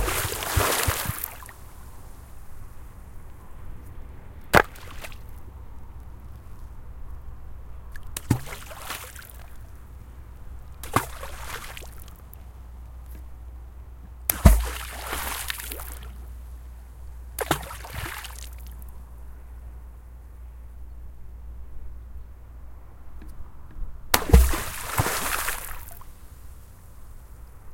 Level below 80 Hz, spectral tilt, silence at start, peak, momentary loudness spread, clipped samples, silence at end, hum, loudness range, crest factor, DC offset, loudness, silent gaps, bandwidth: -32 dBFS; -4 dB/octave; 0 s; 0 dBFS; 24 LU; under 0.1%; 0 s; none; 19 LU; 30 dB; under 0.1%; -26 LUFS; none; 17 kHz